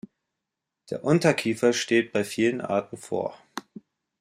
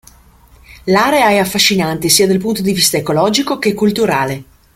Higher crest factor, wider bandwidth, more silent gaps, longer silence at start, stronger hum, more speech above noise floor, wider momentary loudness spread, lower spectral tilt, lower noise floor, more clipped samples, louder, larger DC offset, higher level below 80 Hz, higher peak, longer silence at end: first, 20 dB vs 14 dB; about the same, 15.5 kHz vs 16.5 kHz; neither; first, 0.9 s vs 0.7 s; neither; first, 61 dB vs 32 dB; first, 16 LU vs 6 LU; first, -5 dB/octave vs -3.5 dB/octave; first, -85 dBFS vs -45 dBFS; neither; second, -25 LUFS vs -13 LUFS; neither; second, -68 dBFS vs -46 dBFS; second, -6 dBFS vs 0 dBFS; first, 0.6 s vs 0.3 s